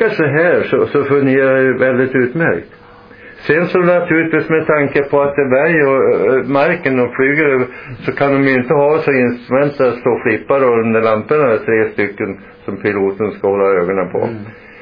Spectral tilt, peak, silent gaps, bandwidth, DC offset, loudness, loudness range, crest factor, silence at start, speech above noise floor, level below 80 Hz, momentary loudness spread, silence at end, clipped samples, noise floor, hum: -10 dB/octave; 0 dBFS; none; 5.2 kHz; under 0.1%; -13 LUFS; 2 LU; 14 dB; 0 s; 25 dB; -50 dBFS; 7 LU; 0 s; under 0.1%; -38 dBFS; none